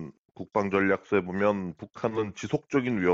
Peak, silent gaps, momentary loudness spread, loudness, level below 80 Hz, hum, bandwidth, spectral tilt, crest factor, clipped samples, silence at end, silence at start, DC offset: -10 dBFS; 0.18-0.25 s; 10 LU; -28 LUFS; -62 dBFS; none; 7.8 kHz; -5.5 dB/octave; 18 dB; under 0.1%; 0 s; 0 s; under 0.1%